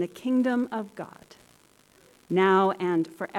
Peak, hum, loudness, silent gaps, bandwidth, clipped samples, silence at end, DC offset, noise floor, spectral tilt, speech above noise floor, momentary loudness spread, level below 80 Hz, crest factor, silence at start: -12 dBFS; none; -25 LUFS; none; 13.5 kHz; under 0.1%; 0 s; under 0.1%; -59 dBFS; -7 dB/octave; 34 dB; 18 LU; -72 dBFS; 16 dB; 0 s